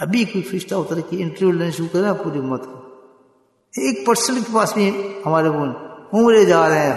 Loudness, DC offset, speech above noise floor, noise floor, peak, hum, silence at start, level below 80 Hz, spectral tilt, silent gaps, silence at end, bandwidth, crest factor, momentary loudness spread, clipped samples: -18 LUFS; under 0.1%; 41 dB; -59 dBFS; -2 dBFS; none; 0 s; -64 dBFS; -5 dB/octave; none; 0 s; 12.5 kHz; 16 dB; 12 LU; under 0.1%